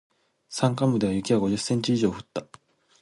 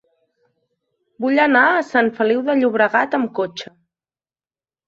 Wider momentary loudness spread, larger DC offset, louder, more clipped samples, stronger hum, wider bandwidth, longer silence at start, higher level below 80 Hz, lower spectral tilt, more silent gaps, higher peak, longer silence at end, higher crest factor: about the same, 13 LU vs 12 LU; neither; second, -25 LUFS vs -17 LUFS; neither; neither; first, 11.5 kHz vs 7.6 kHz; second, 0.5 s vs 1.2 s; first, -56 dBFS vs -68 dBFS; about the same, -6 dB/octave vs -5.5 dB/octave; neither; second, -10 dBFS vs -2 dBFS; second, 0.6 s vs 1.25 s; about the same, 16 dB vs 18 dB